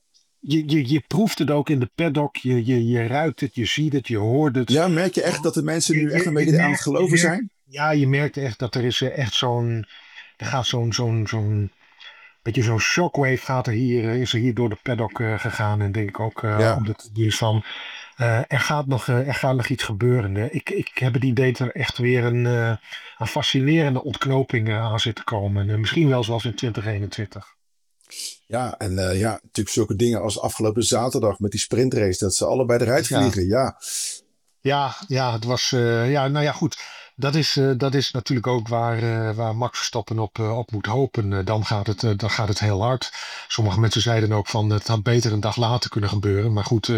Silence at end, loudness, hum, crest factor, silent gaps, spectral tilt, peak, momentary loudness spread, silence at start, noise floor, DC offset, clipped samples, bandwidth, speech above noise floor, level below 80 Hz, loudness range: 0 s; -22 LUFS; none; 16 dB; none; -5.5 dB/octave; -4 dBFS; 7 LU; 0.45 s; -65 dBFS; under 0.1%; under 0.1%; 15.5 kHz; 43 dB; -56 dBFS; 4 LU